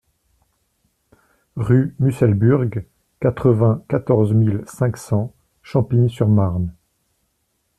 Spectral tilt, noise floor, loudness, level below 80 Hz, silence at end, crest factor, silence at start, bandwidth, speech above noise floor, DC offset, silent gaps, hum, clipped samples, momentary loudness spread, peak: -9 dB/octave; -69 dBFS; -18 LUFS; -48 dBFS; 1.05 s; 16 dB; 1.55 s; 12 kHz; 52 dB; under 0.1%; none; none; under 0.1%; 10 LU; -4 dBFS